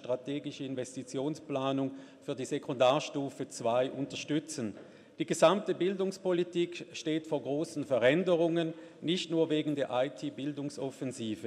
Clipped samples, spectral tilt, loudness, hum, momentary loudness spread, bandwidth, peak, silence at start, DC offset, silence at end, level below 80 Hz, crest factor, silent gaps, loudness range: under 0.1%; -5 dB/octave; -33 LUFS; none; 12 LU; 13 kHz; -12 dBFS; 0 s; under 0.1%; 0 s; -80 dBFS; 20 dB; none; 3 LU